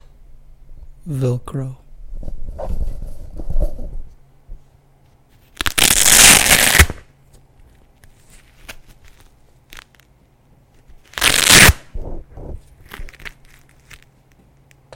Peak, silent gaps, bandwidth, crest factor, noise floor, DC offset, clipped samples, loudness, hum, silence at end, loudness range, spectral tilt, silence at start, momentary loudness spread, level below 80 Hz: 0 dBFS; none; over 20 kHz; 18 dB; -53 dBFS; under 0.1%; 0.2%; -10 LUFS; none; 1.65 s; 20 LU; -1.5 dB/octave; 0.7 s; 30 LU; -28 dBFS